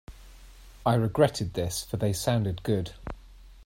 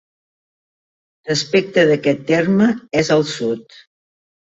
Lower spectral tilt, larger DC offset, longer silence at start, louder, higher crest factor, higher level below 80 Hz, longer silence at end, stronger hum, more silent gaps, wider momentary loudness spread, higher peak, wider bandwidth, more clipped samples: about the same, -6 dB/octave vs -5 dB/octave; neither; second, 0.1 s vs 1.25 s; second, -28 LUFS vs -17 LUFS; about the same, 20 dB vs 16 dB; first, -48 dBFS vs -58 dBFS; second, 0 s vs 0.9 s; neither; neither; first, 16 LU vs 9 LU; second, -8 dBFS vs -2 dBFS; first, 16 kHz vs 8 kHz; neither